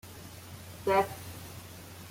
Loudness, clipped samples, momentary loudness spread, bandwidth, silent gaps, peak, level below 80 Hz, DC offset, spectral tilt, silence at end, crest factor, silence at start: -31 LUFS; under 0.1%; 18 LU; 16.5 kHz; none; -12 dBFS; -62 dBFS; under 0.1%; -4.5 dB/octave; 0 s; 22 dB; 0.05 s